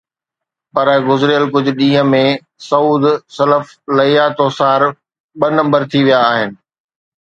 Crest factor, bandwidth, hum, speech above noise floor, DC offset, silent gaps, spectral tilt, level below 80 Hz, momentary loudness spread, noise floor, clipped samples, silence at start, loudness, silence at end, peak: 14 dB; 7.8 kHz; none; 70 dB; under 0.1%; 5.20-5.29 s; -6.5 dB/octave; -60 dBFS; 6 LU; -83 dBFS; under 0.1%; 0.75 s; -13 LUFS; 0.85 s; 0 dBFS